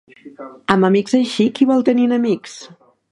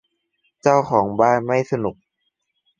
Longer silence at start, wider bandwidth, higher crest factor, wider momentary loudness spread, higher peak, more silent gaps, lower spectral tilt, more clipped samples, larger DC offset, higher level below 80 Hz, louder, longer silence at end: second, 0.25 s vs 0.65 s; first, 11.5 kHz vs 7.6 kHz; about the same, 16 dB vs 20 dB; first, 21 LU vs 8 LU; about the same, 0 dBFS vs -2 dBFS; neither; about the same, -6 dB/octave vs -7 dB/octave; neither; neither; about the same, -60 dBFS vs -58 dBFS; first, -16 LUFS vs -19 LUFS; second, 0.45 s vs 0.85 s